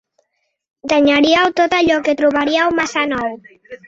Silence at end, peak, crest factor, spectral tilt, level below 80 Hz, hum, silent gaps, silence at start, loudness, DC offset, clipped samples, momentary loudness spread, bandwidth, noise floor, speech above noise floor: 0.1 s; 0 dBFS; 16 dB; -3.5 dB/octave; -52 dBFS; none; none; 0.85 s; -15 LUFS; under 0.1%; under 0.1%; 8 LU; 7.8 kHz; -70 dBFS; 55 dB